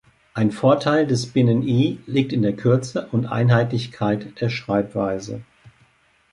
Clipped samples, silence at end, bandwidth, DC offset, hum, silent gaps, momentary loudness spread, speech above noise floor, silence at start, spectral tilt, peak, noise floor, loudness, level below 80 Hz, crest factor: under 0.1%; 0.65 s; 11 kHz; under 0.1%; none; none; 8 LU; 39 dB; 0.35 s; -7 dB/octave; -4 dBFS; -59 dBFS; -21 LUFS; -56 dBFS; 18 dB